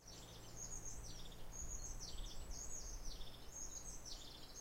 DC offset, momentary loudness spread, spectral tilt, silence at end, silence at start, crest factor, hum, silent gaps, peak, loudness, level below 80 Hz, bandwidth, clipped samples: under 0.1%; 6 LU; -2 dB/octave; 0 s; 0 s; 14 dB; none; none; -34 dBFS; -51 LUFS; -54 dBFS; 16 kHz; under 0.1%